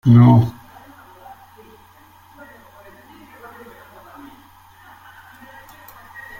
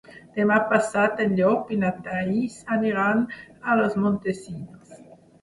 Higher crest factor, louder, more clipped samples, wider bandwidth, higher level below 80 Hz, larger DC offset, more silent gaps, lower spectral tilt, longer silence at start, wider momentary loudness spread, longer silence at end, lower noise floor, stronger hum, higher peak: about the same, 20 dB vs 20 dB; first, -13 LUFS vs -23 LUFS; neither; first, 15.5 kHz vs 11.5 kHz; first, -50 dBFS vs -60 dBFS; neither; neither; first, -9.5 dB/octave vs -7 dB/octave; about the same, 0.05 s vs 0.1 s; first, 31 LU vs 12 LU; first, 5.9 s vs 0.4 s; about the same, -48 dBFS vs -48 dBFS; neither; about the same, -2 dBFS vs -4 dBFS